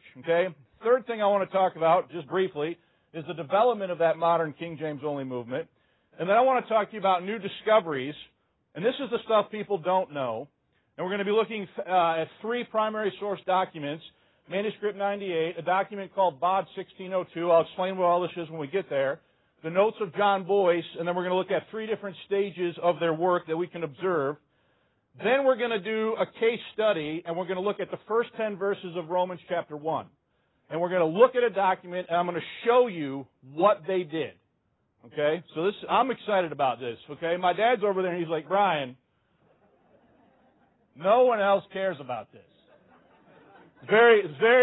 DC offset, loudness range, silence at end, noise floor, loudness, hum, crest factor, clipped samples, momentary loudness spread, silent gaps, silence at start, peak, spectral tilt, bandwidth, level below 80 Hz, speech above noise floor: under 0.1%; 3 LU; 0 s; -73 dBFS; -27 LUFS; none; 20 dB; under 0.1%; 12 LU; none; 0.15 s; -6 dBFS; -9.5 dB/octave; 4.1 kHz; -74 dBFS; 47 dB